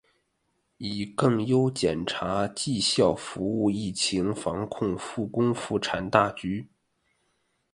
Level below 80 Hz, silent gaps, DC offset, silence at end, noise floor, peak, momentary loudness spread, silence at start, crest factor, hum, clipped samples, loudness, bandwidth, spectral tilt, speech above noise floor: -56 dBFS; none; under 0.1%; 1.1 s; -74 dBFS; -2 dBFS; 9 LU; 0.8 s; 26 dB; none; under 0.1%; -27 LUFS; 11.5 kHz; -5 dB/octave; 48 dB